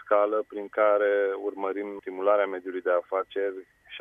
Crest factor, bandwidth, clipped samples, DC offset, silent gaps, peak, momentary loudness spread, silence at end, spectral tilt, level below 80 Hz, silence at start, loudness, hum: 18 dB; 3.7 kHz; under 0.1%; under 0.1%; none; -8 dBFS; 10 LU; 0 s; -6 dB/octave; -76 dBFS; 0 s; -27 LUFS; none